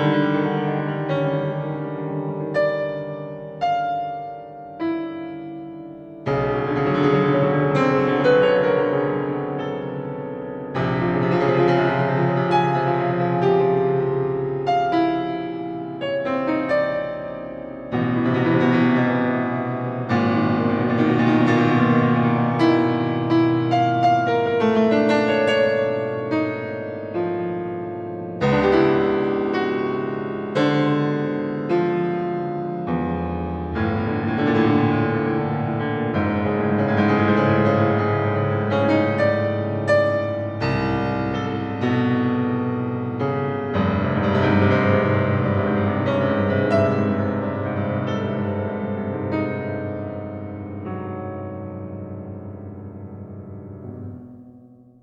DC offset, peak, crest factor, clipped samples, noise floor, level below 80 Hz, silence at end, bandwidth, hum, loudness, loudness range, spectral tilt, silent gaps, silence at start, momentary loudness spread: under 0.1%; -6 dBFS; 16 dB; under 0.1%; -47 dBFS; -50 dBFS; 0.35 s; 8.4 kHz; none; -21 LUFS; 8 LU; -8.5 dB/octave; none; 0 s; 13 LU